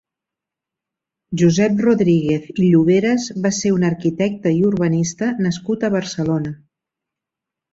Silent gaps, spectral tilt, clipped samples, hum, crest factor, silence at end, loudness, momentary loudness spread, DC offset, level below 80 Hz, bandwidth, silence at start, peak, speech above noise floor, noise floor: none; -6.5 dB/octave; under 0.1%; none; 16 dB; 1.2 s; -17 LUFS; 7 LU; under 0.1%; -54 dBFS; 7.8 kHz; 1.3 s; -4 dBFS; 69 dB; -85 dBFS